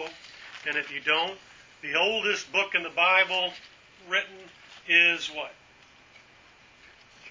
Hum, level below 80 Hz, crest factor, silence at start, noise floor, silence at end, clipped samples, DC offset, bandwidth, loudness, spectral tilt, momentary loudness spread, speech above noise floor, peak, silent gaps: none; -72 dBFS; 22 dB; 0 s; -56 dBFS; 0 s; under 0.1%; under 0.1%; 7.6 kHz; -24 LUFS; -1.5 dB/octave; 21 LU; 29 dB; -6 dBFS; none